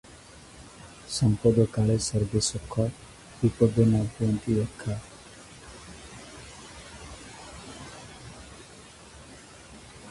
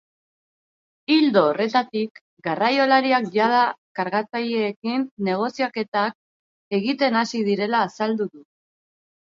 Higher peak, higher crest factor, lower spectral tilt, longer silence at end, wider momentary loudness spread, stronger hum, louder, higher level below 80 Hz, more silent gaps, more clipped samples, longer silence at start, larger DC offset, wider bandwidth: about the same, -6 dBFS vs -4 dBFS; about the same, 22 dB vs 20 dB; about the same, -6 dB/octave vs -5.5 dB/octave; second, 0 s vs 0.8 s; first, 24 LU vs 10 LU; neither; second, -26 LUFS vs -22 LUFS; first, -48 dBFS vs -74 dBFS; second, none vs 2.11-2.15 s, 2.21-2.37 s, 3.78-3.95 s, 4.76-4.82 s, 5.11-5.17 s, 5.88-5.92 s, 6.15-6.71 s; neither; second, 0.35 s vs 1.1 s; neither; first, 11.5 kHz vs 7.6 kHz